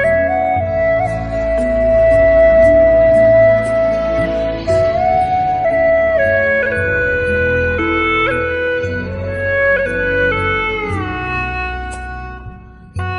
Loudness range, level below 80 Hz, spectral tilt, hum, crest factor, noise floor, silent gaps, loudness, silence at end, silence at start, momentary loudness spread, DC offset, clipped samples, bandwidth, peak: 6 LU; -30 dBFS; -7 dB/octave; none; 12 dB; -34 dBFS; none; -14 LUFS; 0 s; 0 s; 12 LU; under 0.1%; under 0.1%; 10.5 kHz; -2 dBFS